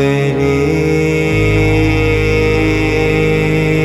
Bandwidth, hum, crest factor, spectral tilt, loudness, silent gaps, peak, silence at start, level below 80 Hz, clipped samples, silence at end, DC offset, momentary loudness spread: 14.5 kHz; none; 12 dB; -6.5 dB/octave; -13 LUFS; none; 0 dBFS; 0 s; -24 dBFS; under 0.1%; 0 s; under 0.1%; 1 LU